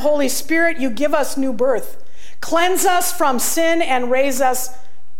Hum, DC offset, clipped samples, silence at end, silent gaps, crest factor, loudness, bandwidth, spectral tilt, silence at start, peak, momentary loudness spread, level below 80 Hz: none; 10%; under 0.1%; 0.45 s; none; 14 dB; -18 LUFS; 17 kHz; -2.5 dB/octave; 0 s; -4 dBFS; 7 LU; -52 dBFS